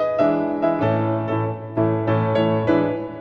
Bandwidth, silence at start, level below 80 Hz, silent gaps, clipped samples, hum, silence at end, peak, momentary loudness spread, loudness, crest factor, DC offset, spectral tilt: 5.8 kHz; 0 s; -52 dBFS; none; under 0.1%; none; 0 s; -6 dBFS; 5 LU; -21 LUFS; 14 dB; under 0.1%; -9.5 dB/octave